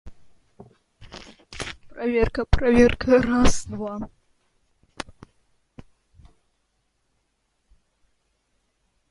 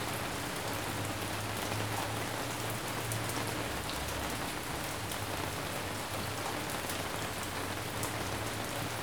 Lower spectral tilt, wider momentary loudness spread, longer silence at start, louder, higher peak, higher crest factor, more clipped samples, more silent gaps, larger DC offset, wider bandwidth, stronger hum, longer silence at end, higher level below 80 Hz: first, -5.5 dB/octave vs -3.5 dB/octave; first, 25 LU vs 2 LU; about the same, 0.05 s vs 0 s; first, -22 LUFS vs -36 LUFS; first, -2 dBFS vs -14 dBFS; about the same, 22 dB vs 22 dB; neither; neither; second, under 0.1% vs 0.2%; second, 11.5 kHz vs over 20 kHz; neither; first, 4.1 s vs 0 s; first, -36 dBFS vs -52 dBFS